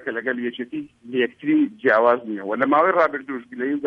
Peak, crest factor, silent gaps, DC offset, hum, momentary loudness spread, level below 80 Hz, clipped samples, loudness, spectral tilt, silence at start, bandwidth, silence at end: -4 dBFS; 18 dB; none; under 0.1%; none; 14 LU; -70 dBFS; under 0.1%; -21 LUFS; -7.5 dB/octave; 0 s; 5.4 kHz; 0 s